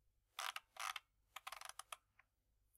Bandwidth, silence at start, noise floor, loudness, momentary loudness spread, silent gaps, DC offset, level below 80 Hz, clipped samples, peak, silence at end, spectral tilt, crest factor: 16 kHz; 0.35 s; -83 dBFS; -51 LUFS; 10 LU; none; under 0.1%; -84 dBFS; under 0.1%; -26 dBFS; 0.8 s; 3 dB/octave; 28 dB